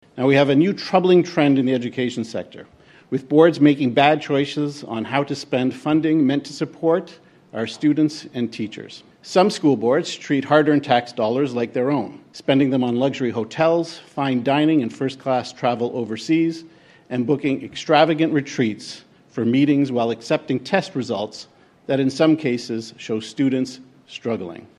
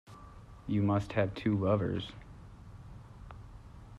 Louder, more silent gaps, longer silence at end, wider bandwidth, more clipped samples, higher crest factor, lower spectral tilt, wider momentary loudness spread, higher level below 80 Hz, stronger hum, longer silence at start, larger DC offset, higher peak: first, -20 LUFS vs -32 LUFS; neither; first, 0.15 s vs 0 s; first, 11 kHz vs 8.2 kHz; neither; about the same, 20 dB vs 18 dB; second, -6.5 dB/octave vs -8.5 dB/octave; second, 13 LU vs 22 LU; second, -66 dBFS vs -54 dBFS; neither; about the same, 0.15 s vs 0.1 s; neither; first, 0 dBFS vs -16 dBFS